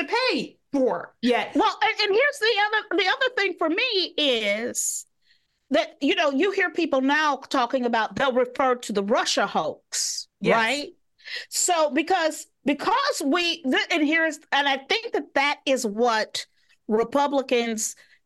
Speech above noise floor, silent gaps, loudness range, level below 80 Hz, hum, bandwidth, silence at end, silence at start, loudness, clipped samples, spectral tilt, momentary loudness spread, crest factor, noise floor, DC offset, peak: 42 dB; none; 2 LU; -68 dBFS; none; 12.5 kHz; 0.35 s; 0 s; -23 LUFS; under 0.1%; -2 dB/octave; 7 LU; 18 dB; -66 dBFS; under 0.1%; -6 dBFS